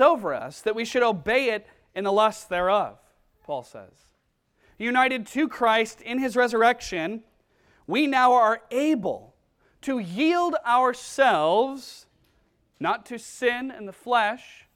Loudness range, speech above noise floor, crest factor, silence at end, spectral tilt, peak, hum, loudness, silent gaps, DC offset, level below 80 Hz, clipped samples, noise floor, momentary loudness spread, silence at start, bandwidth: 4 LU; 47 dB; 20 dB; 0.3 s; -4 dB/octave; -4 dBFS; none; -24 LUFS; none; under 0.1%; -60 dBFS; under 0.1%; -71 dBFS; 14 LU; 0 s; 16 kHz